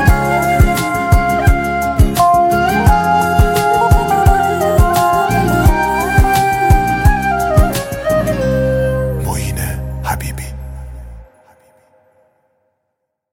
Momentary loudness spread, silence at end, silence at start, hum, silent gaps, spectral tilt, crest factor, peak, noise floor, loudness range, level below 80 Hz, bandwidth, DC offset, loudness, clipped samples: 9 LU; 2.1 s; 0 s; none; none; -6 dB/octave; 14 dB; 0 dBFS; -73 dBFS; 12 LU; -20 dBFS; 17 kHz; under 0.1%; -13 LUFS; under 0.1%